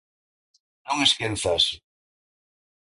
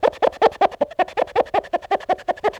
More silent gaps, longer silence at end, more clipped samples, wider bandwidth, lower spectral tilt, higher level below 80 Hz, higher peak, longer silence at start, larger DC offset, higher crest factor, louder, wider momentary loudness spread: neither; first, 1.05 s vs 0 s; neither; about the same, 11.5 kHz vs 12 kHz; second, -2.5 dB/octave vs -4.5 dB/octave; about the same, -52 dBFS vs -54 dBFS; about the same, -4 dBFS vs -2 dBFS; first, 0.85 s vs 0 s; neither; first, 24 dB vs 18 dB; about the same, -22 LUFS vs -21 LUFS; first, 9 LU vs 5 LU